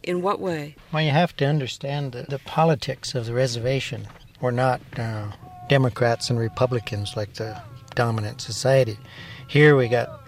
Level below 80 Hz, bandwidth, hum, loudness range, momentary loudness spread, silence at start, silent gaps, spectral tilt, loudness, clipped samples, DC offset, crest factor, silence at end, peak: -54 dBFS; 15 kHz; none; 3 LU; 13 LU; 0.05 s; none; -6 dB/octave; -23 LUFS; under 0.1%; under 0.1%; 20 dB; 0.05 s; -4 dBFS